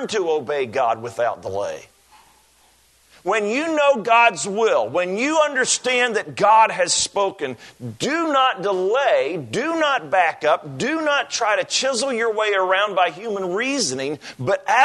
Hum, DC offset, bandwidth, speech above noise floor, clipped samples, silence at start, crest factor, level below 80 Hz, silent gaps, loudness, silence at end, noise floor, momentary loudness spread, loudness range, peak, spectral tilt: none; under 0.1%; 12.5 kHz; 37 dB; under 0.1%; 0 s; 18 dB; -66 dBFS; none; -20 LUFS; 0 s; -56 dBFS; 11 LU; 5 LU; -2 dBFS; -2.5 dB/octave